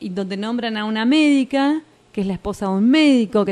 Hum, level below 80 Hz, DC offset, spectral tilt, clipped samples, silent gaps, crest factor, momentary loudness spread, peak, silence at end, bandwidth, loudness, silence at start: none; -50 dBFS; under 0.1%; -5.5 dB/octave; under 0.1%; none; 14 dB; 11 LU; -4 dBFS; 0 s; 11 kHz; -18 LUFS; 0 s